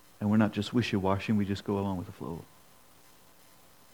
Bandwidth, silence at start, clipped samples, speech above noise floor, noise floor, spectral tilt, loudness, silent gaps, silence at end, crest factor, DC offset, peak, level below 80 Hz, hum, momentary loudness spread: 19.5 kHz; 0.2 s; under 0.1%; 30 dB; -59 dBFS; -7 dB/octave; -30 LUFS; none; 1.5 s; 20 dB; under 0.1%; -12 dBFS; -66 dBFS; none; 14 LU